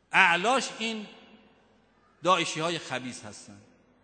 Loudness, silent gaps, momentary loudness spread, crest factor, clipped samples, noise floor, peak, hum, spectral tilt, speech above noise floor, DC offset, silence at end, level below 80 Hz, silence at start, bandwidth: -26 LUFS; none; 23 LU; 24 dB; under 0.1%; -63 dBFS; -4 dBFS; none; -2.5 dB/octave; 36 dB; under 0.1%; 0.45 s; -74 dBFS; 0.1 s; 9.4 kHz